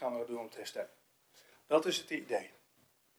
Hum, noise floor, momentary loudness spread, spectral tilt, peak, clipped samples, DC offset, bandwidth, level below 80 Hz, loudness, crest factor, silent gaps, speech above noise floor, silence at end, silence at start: none; -71 dBFS; 14 LU; -3 dB/octave; -16 dBFS; under 0.1%; under 0.1%; over 20 kHz; under -90 dBFS; -37 LUFS; 22 dB; none; 35 dB; 0.7 s; 0 s